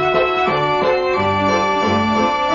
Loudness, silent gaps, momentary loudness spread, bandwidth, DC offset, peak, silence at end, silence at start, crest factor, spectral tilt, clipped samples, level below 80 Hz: -16 LUFS; none; 1 LU; 7.4 kHz; under 0.1%; -2 dBFS; 0 s; 0 s; 14 dB; -5.5 dB/octave; under 0.1%; -44 dBFS